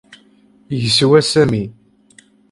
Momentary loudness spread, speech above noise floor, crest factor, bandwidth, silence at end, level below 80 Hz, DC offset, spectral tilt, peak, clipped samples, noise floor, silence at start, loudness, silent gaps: 14 LU; 37 dB; 16 dB; 11.5 kHz; 0.8 s; -48 dBFS; under 0.1%; -5 dB/octave; 0 dBFS; under 0.1%; -51 dBFS; 0.7 s; -14 LUFS; none